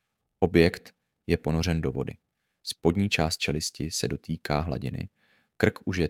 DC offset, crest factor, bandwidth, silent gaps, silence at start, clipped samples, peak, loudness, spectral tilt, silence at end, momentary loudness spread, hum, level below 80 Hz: under 0.1%; 24 dB; 16.5 kHz; none; 0.4 s; under 0.1%; -4 dBFS; -27 LUFS; -5 dB/octave; 0 s; 14 LU; none; -44 dBFS